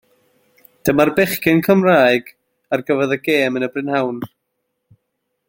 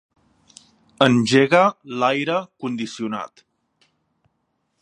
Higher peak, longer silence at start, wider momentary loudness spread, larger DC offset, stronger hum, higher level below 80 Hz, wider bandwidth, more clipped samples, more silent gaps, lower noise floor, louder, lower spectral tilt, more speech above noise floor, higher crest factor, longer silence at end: about the same, 0 dBFS vs 0 dBFS; second, 0.85 s vs 1 s; second, 11 LU vs 14 LU; neither; neither; first, -54 dBFS vs -66 dBFS; first, 16.5 kHz vs 11.5 kHz; neither; neither; about the same, -74 dBFS vs -72 dBFS; first, -16 LUFS vs -19 LUFS; about the same, -5.5 dB/octave vs -5.5 dB/octave; first, 58 dB vs 53 dB; about the same, 18 dB vs 22 dB; second, 1.2 s vs 1.55 s